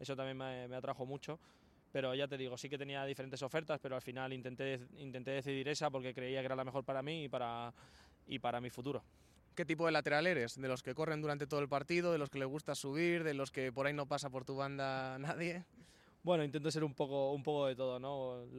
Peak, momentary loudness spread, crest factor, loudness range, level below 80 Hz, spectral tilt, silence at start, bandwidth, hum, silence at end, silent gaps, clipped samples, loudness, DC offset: -20 dBFS; 9 LU; 20 dB; 5 LU; -74 dBFS; -5.5 dB/octave; 0 s; 14 kHz; none; 0 s; none; under 0.1%; -40 LUFS; under 0.1%